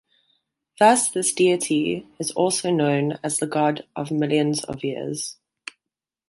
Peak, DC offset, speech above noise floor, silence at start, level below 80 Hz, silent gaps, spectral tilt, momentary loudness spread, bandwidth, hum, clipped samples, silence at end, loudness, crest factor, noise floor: -4 dBFS; under 0.1%; 65 dB; 0.8 s; -64 dBFS; none; -4 dB/octave; 12 LU; 12 kHz; none; under 0.1%; 0.95 s; -22 LUFS; 20 dB; -87 dBFS